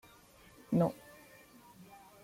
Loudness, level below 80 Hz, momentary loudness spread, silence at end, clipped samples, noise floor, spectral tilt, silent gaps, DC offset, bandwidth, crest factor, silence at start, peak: -34 LUFS; -70 dBFS; 25 LU; 0.4 s; under 0.1%; -60 dBFS; -8.5 dB/octave; none; under 0.1%; 16.5 kHz; 20 dB; 0.7 s; -18 dBFS